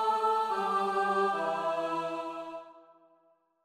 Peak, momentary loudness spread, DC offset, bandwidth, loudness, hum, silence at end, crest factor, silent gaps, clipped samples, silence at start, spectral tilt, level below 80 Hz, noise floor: -16 dBFS; 12 LU; under 0.1%; 15 kHz; -30 LUFS; none; 0.85 s; 14 dB; none; under 0.1%; 0 s; -4.5 dB/octave; -78 dBFS; -69 dBFS